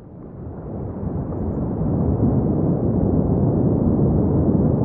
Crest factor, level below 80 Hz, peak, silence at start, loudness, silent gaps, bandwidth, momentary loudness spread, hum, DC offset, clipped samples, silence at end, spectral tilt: 14 dB; -32 dBFS; -6 dBFS; 0 s; -20 LUFS; none; 2.2 kHz; 13 LU; none; under 0.1%; under 0.1%; 0 s; -16 dB/octave